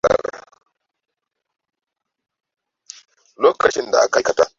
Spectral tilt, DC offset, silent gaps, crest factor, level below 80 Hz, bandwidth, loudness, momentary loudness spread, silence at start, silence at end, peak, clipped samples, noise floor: -2.5 dB/octave; under 0.1%; none; 20 dB; -54 dBFS; 7.8 kHz; -17 LUFS; 5 LU; 0.05 s; 0.1 s; -2 dBFS; under 0.1%; -81 dBFS